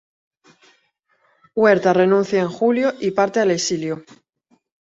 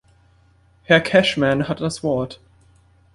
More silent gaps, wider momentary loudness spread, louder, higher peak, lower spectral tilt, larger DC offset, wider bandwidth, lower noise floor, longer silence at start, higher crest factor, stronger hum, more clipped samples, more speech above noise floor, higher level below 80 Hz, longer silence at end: neither; about the same, 11 LU vs 10 LU; about the same, -18 LUFS vs -18 LUFS; about the same, -2 dBFS vs -2 dBFS; about the same, -5 dB/octave vs -5 dB/octave; neither; second, 8 kHz vs 11.5 kHz; first, -64 dBFS vs -55 dBFS; first, 1.55 s vs 0.9 s; about the same, 18 dB vs 20 dB; neither; neither; first, 47 dB vs 37 dB; second, -64 dBFS vs -52 dBFS; about the same, 0.85 s vs 0.8 s